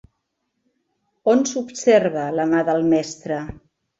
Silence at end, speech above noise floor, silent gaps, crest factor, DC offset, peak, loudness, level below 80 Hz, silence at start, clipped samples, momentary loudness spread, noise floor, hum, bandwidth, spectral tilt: 0.45 s; 56 dB; none; 18 dB; under 0.1%; -2 dBFS; -20 LUFS; -54 dBFS; 1.25 s; under 0.1%; 11 LU; -75 dBFS; none; 8 kHz; -5 dB/octave